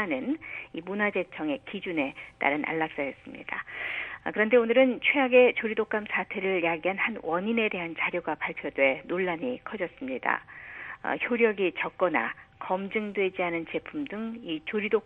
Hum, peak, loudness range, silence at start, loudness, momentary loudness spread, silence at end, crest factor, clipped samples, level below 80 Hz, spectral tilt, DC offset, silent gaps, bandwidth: none; -8 dBFS; 6 LU; 0 s; -28 LUFS; 12 LU; 0.05 s; 20 dB; under 0.1%; -66 dBFS; -7.5 dB/octave; under 0.1%; none; 4 kHz